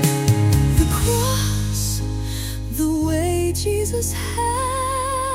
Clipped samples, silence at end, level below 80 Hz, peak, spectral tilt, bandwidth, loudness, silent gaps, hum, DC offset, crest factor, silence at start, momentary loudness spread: under 0.1%; 0 s; -28 dBFS; -4 dBFS; -5 dB/octave; 16.5 kHz; -20 LUFS; none; none; under 0.1%; 16 dB; 0 s; 8 LU